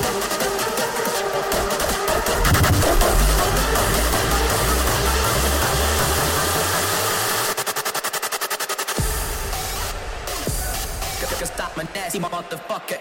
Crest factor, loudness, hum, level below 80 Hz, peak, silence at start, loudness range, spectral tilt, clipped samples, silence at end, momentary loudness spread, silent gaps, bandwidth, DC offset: 18 dB; -21 LUFS; none; -28 dBFS; -4 dBFS; 0 s; 7 LU; -3 dB/octave; under 0.1%; 0 s; 9 LU; none; 17 kHz; under 0.1%